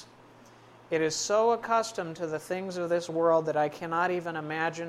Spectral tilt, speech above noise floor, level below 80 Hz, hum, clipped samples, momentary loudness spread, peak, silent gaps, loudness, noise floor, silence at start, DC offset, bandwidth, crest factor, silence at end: -4 dB/octave; 26 dB; -72 dBFS; none; under 0.1%; 9 LU; -12 dBFS; none; -29 LUFS; -54 dBFS; 0 s; under 0.1%; 14.5 kHz; 16 dB; 0 s